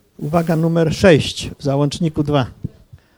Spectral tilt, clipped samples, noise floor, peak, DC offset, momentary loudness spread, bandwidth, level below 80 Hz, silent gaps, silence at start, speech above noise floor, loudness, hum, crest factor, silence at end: -6.5 dB/octave; under 0.1%; -45 dBFS; 0 dBFS; under 0.1%; 12 LU; over 20 kHz; -42 dBFS; none; 0.2 s; 29 dB; -17 LUFS; none; 18 dB; 0.5 s